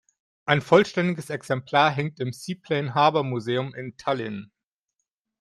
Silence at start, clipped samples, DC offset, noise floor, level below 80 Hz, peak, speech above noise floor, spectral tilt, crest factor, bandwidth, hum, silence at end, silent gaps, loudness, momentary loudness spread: 0.45 s; under 0.1%; under 0.1%; -82 dBFS; -66 dBFS; -2 dBFS; 58 dB; -6 dB/octave; 22 dB; 13 kHz; none; 0.95 s; none; -24 LUFS; 14 LU